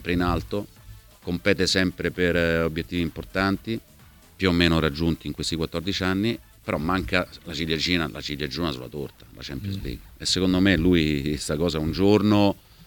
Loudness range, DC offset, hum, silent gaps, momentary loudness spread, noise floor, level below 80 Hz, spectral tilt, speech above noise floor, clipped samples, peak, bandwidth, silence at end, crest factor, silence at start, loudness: 4 LU; under 0.1%; none; none; 13 LU; -47 dBFS; -40 dBFS; -5 dB/octave; 23 dB; under 0.1%; -4 dBFS; 19 kHz; 0 s; 20 dB; 0 s; -24 LUFS